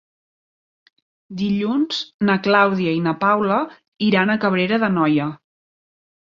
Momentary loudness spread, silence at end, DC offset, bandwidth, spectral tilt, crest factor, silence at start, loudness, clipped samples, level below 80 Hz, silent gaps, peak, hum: 7 LU; 0.95 s; under 0.1%; 7.2 kHz; -7 dB/octave; 18 dB; 1.3 s; -19 LUFS; under 0.1%; -62 dBFS; 2.14-2.19 s, 3.88-3.92 s; -2 dBFS; none